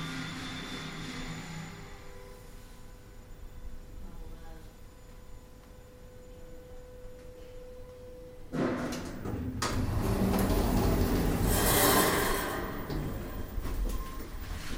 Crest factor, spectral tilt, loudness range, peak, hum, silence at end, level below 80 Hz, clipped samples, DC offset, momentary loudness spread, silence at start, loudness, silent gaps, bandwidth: 20 dB; -4.5 dB/octave; 23 LU; -12 dBFS; none; 0 s; -40 dBFS; under 0.1%; under 0.1%; 25 LU; 0 s; -31 LUFS; none; 16.5 kHz